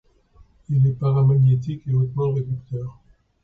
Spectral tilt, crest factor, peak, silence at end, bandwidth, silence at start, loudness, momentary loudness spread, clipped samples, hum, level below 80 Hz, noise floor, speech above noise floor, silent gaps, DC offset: -11.5 dB/octave; 12 dB; -10 dBFS; 0.5 s; 3.6 kHz; 0.7 s; -21 LUFS; 14 LU; under 0.1%; none; -50 dBFS; -53 dBFS; 34 dB; none; under 0.1%